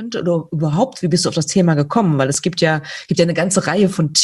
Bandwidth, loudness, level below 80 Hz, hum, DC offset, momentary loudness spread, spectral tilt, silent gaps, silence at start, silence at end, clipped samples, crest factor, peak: 12.5 kHz; -17 LUFS; -54 dBFS; none; under 0.1%; 5 LU; -4.5 dB/octave; none; 0 s; 0 s; under 0.1%; 16 dB; 0 dBFS